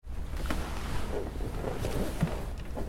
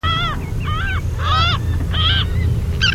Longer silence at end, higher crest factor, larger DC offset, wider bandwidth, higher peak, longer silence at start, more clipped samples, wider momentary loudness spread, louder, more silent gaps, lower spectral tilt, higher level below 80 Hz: about the same, 0 s vs 0 s; first, 18 dB vs 12 dB; second, under 0.1% vs 0.2%; about the same, 16.5 kHz vs 16 kHz; second, -16 dBFS vs -4 dBFS; about the same, 0 s vs 0.05 s; neither; about the same, 6 LU vs 6 LU; second, -36 LUFS vs -18 LUFS; neither; about the same, -6 dB/octave vs -5 dB/octave; second, -36 dBFS vs -22 dBFS